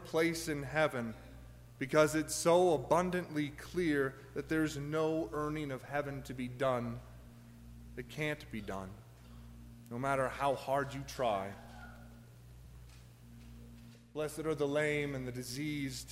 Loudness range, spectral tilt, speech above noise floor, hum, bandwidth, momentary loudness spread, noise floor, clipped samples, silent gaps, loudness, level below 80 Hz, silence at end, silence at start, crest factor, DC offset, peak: 10 LU; -5 dB/octave; 20 dB; none; 16 kHz; 24 LU; -55 dBFS; under 0.1%; none; -35 LUFS; -58 dBFS; 0 s; 0 s; 22 dB; under 0.1%; -14 dBFS